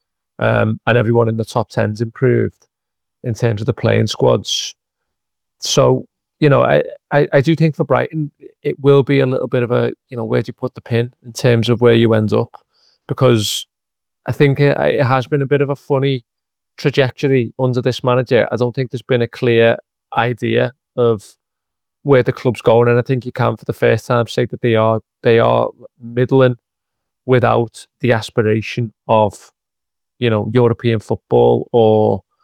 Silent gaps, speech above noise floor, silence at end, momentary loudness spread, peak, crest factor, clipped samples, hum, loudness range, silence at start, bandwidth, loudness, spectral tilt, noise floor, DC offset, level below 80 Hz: none; 69 dB; 0.25 s; 10 LU; -2 dBFS; 14 dB; under 0.1%; none; 2 LU; 0.4 s; 14.5 kHz; -16 LUFS; -6.5 dB/octave; -83 dBFS; under 0.1%; -50 dBFS